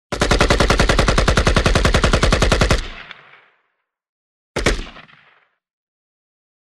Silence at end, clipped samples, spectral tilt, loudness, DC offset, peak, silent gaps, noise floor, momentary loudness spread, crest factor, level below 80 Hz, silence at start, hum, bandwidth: 1.7 s; under 0.1%; -4.5 dB/octave; -16 LUFS; under 0.1%; -2 dBFS; 4.09-4.55 s; -71 dBFS; 15 LU; 16 dB; -22 dBFS; 0.1 s; none; 13 kHz